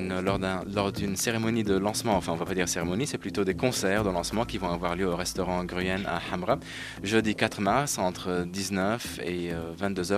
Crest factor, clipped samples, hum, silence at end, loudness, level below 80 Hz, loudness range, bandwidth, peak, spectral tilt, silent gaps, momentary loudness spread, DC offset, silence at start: 22 dB; under 0.1%; none; 0 s; -28 LUFS; -48 dBFS; 1 LU; 14.5 kHz; -6 dBFS; -4.5 dB/octave; none; 5 LU; under 0.1%; 0 s